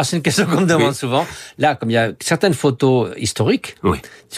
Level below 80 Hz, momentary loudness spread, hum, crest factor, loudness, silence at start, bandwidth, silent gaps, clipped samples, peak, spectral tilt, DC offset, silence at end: -46 dBFS; 6 LU; none; 14 dB; -17 LUFS; 0 s; 16 kHz; none; under 0.1%; -4 dBFS; -5 dB/octave; under 0.1%; 0 s